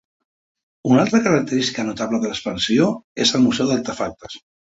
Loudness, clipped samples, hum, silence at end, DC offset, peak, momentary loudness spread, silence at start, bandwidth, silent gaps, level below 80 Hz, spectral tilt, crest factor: -19 LUFS; under 0.1%; none; 0.35 s; under 0.1%; -2 dBFS; 12 LU; 0.85 s; 8 kHz; 3.04-3.16 s; -54 dBFS; -4.5 dB/octave; 18 dB